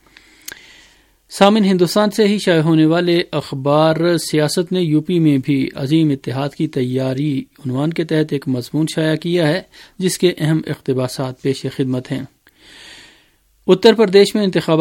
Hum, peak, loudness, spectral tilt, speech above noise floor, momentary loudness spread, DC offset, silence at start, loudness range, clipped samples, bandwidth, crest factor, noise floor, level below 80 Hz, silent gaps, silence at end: none; 0 dBFS; -16 LUFS; -6 dB/octave; 40 dB; 11 LU; under 0.1%; 1.3 s; 6 LU; under 0.1%; 17 kHz; 16 dB; -55 dBFS; -56 dBFS; none; 0 s